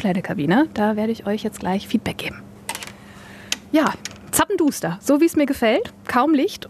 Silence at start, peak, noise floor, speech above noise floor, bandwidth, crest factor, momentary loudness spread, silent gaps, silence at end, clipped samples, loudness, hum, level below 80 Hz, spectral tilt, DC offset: 0 s; 0 dBFS; -41 dBFS; 21 dB; 14.5 kHz; 20 dB; 14 LU; none; 0.15 s; under 0.1%; -21 LUFS; none; -52 dBFS; -4.5 dB/octave; under 0.1%